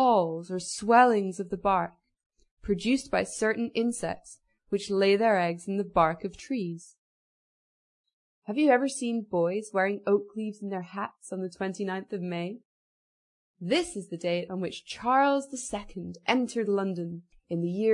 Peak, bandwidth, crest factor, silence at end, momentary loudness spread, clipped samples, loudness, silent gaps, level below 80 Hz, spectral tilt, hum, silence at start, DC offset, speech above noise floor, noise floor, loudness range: -6 dBFS; 11 kHz; 22 dB; 0 s; 13 LU; under 0.1%; -28 LUFS; 2.26-2.30 s, 2.51-2.57 s, 6.98-8.04 s, 8.13-8.42 s, 12.65-13.54 s; -60 dBFS; -5 dB/octave; none; 0 s; under 0.1%; over 62 dB; under -90 dBFS; 6 LU